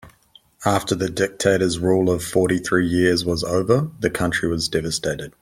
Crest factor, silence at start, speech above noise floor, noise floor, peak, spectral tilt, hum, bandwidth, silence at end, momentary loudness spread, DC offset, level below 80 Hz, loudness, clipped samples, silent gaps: 18 dB; 0.05 s; 34 dB; -54 dBFS; -2 dBFS; -5 dB/octave; none; 16 kHz; 0.15 s; 5 LU; under 0.1%; -46 dBFS; -20 LUFS; under 0.1%; none